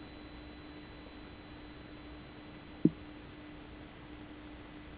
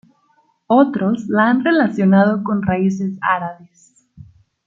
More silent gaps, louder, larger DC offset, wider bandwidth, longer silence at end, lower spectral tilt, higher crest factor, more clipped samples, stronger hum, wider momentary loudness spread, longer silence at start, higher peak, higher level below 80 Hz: neither; second, -43 LUFS vs -16 LUFS; neither; second, 4 kHz vs 7.4 kHz; second, 0 s vs 0.45 s; second, -6.5 dB/octave vs -8 dB/octave; first, 32 dB vs 16 dB; neither; neither; first, 17 LU vs 6 LU; second, 0 s vs 0.7 s; second, -10 dBFS vs -2 dBFS; about the same, -58 dBFS vs -56 dBFS